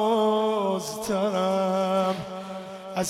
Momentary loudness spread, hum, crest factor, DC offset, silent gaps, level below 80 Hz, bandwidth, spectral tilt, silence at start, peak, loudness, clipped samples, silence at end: 13 LU; none; 12 dB; under 0.1%; none; -64 dBFS; 15.5 kHz; -5 dB/octave; 0 s; -14 dBFS; -25 LUFS; under 0.1%; 0 s